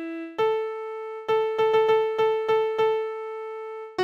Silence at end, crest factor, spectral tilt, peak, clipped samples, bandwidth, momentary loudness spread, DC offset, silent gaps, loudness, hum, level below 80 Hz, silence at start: 0 s; 14 dB; -5 dB/octave; -12 dBFS; under 0.1%; 6.8 kHz; 13 LU; under 0.1%; none; -25 LUFS; none; -70 dBFS; 0 s